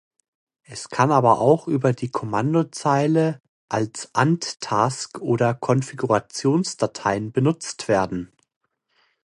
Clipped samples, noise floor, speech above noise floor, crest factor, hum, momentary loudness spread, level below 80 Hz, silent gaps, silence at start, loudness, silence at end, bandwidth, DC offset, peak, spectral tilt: under 0.1%; -66 dBFS; 45 dB; 20 dB; none; 10 LU; -58 dBFS; 3.49-3.68 s; 0.7 s; -22 LUFS; 1 s; 11.5 kHz; under 0.1%; -2 dBFS; -6 dB/octave